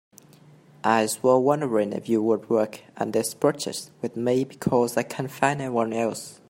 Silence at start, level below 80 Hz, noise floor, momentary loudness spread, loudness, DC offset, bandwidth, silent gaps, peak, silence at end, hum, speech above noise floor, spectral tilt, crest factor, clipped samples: 0.85 s; -68 dBFS; -52 dBFS; 10 LU; -24 LUFS; under 0.1%; 16.5 kHz; none; -4 dBFS; 0.15 s; none; 28 dB; -5 dB/octave; 20 dB; under 0.1%